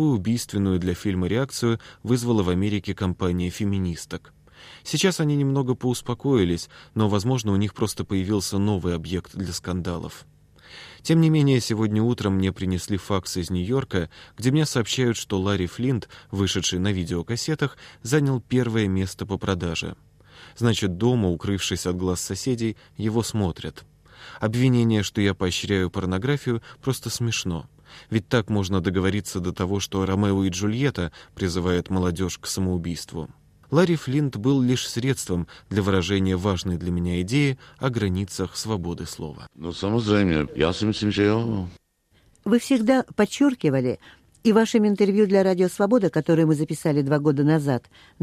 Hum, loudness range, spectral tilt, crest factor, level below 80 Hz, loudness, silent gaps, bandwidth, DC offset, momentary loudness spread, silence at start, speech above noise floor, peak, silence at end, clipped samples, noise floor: none; 5 LU; -6 dB/octave; 18 dB; -48 dBFS; -24 LUFS; none; 15 kHz; under 0.1%; 9 LU; 0 s; 38 dB; -6 dBFS; 0.45 s; under 0.1%; -61 dBFS